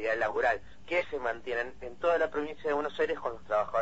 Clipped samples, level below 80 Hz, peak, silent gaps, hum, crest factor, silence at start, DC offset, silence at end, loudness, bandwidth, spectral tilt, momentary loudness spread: under 0.1%; -58 dBFS; -16 dBFS; none; none; 16 dB; 0 s; 0.5%; 0 s; -31 LUFS; 8 kHz; -5 dB/octave; 6 LU